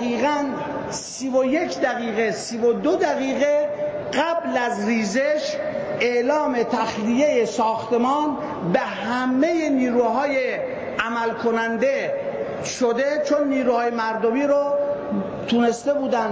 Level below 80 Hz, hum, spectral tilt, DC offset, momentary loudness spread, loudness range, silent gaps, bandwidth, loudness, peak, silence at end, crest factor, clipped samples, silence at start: -58 dBFS; none; -4.5 dB/octave; under 0.1%; 7 LU; 1 LU; none; 8 kHz; -22 LUFS; -8 dBFS; 0 s; 14 dB; under 0.1%; 0 s